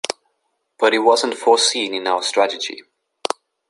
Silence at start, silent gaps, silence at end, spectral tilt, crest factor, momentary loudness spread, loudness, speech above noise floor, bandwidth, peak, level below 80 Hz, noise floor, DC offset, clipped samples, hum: 0.05 s; none; 0.45 s; -0.5 dB/octave; 18 dB; 14 LU; -18 LUFS; 53 dB; 11.5 kHz; -2 dBFS; -72 dBFS; -71 dBFS; under 0.1%; under 0.1%; none